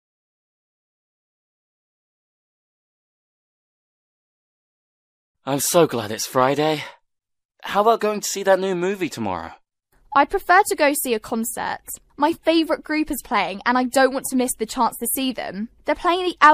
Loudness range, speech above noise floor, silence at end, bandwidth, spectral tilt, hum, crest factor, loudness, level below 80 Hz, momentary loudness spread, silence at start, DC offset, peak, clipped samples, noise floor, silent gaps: 3 LU; 40 dB; 0 s; 15.5 kHz; -3.5 dB/octave; none; 22 dB; -21 LUFS; -52 dBFS; 11 LU; 5.45 s; under 0.1%; 0 dBFS; under 0.1%; -60 dBFS; 7.45-7.49 s